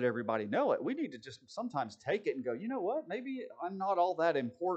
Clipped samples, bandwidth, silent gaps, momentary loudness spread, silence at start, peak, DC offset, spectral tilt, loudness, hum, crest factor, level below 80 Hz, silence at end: under 0.1%; 8.6 kHz; none; 10 LU; 0 s; -16 dBFS; under 0.1%; -6.5 dB/octave; -35 LUFS; none; 18 dB; -86 dBFS; 0 s